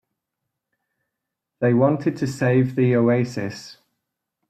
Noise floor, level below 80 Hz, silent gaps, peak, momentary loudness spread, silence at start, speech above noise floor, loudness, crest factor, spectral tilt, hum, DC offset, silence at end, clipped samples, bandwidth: -82 dBFS; -62 dBFS; none; -6 dBFS; 11 LU; 1.6 s; 63 dB; -20 LUFS; 18 dB; -8 dB/octave; none; under 0.1%; 0.75 s; under 0.1%; 9 kHz